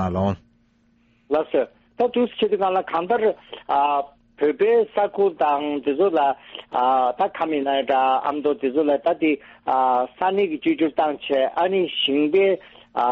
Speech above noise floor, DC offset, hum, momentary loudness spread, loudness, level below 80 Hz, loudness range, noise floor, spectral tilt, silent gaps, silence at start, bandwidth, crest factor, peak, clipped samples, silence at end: 40 dB; under 0.1%; none; 6 LU; -21 LUFS; -60 dBFS; 2 LU; -61 dBFS; -3.5 dB/octave; none; 0 s; 5.2 kHz; 14 dB; -6 dBFS; under 0.1%; 0 s